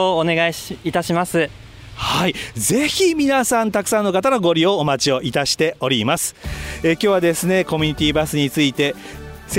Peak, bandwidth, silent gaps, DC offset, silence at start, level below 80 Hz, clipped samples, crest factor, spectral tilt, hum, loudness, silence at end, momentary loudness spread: -4 dBFS; 16.5 kHz; none; under 0.1%; 0 s; -42 dBFS; under 0.1%; 14 dB; -4 dB/octave; none; -18 LUFS; 0 s; 8 LU